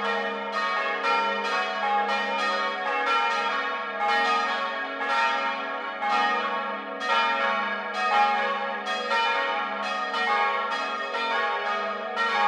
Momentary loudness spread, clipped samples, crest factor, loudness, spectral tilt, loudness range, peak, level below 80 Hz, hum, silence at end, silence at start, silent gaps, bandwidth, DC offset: 5 LU; under 0.1%; 16 dB; -25 LUFS; -2 dB/octave; 1 LU; -10 dBFS; -82 dBFS; none; 0 s; 0 s; none; 11 kHz; under 0.1%